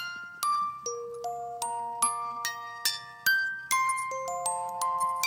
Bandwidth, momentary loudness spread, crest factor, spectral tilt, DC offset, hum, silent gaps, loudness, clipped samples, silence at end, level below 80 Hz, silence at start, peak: 17 kHz; 9 LU; 22 dB; 1 dB/octave; under 0.1%; none; none; -30 LUFS; under 0.1%; 0 s; -74 dBFS; 0 s; -10 dBFS